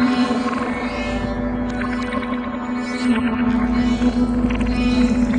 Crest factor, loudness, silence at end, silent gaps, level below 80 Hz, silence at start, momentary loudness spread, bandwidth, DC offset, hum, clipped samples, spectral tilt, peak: 14 dB; -20 LUFS; 0 s; none; -30 dBFS; 0 s; 6 LU; 9.8 kHz; under 0.1%; none; under 0.1%; -6.5 dB/octave; -6 dBFS